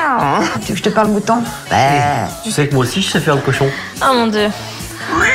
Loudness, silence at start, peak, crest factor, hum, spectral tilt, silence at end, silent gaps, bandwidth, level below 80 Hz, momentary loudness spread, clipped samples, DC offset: -15 LUFS; 0 s; -2 dBFS; 12 dB; none; -4.5 dB/octave; 0 s; none; 16 kHz; -40 dBFS; 6 LU; under 0.1%; under 0.1%